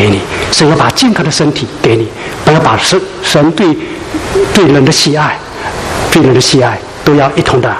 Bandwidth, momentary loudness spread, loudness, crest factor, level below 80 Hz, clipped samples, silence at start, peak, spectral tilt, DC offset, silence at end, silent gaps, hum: 15 kHz; 9 LU; -9 LUFS; 10 dB; -32 dBFS; 0.5%; 0 s; 0 dBFS; -4.5 dB/octave; under 0.1%; 0 s; none; none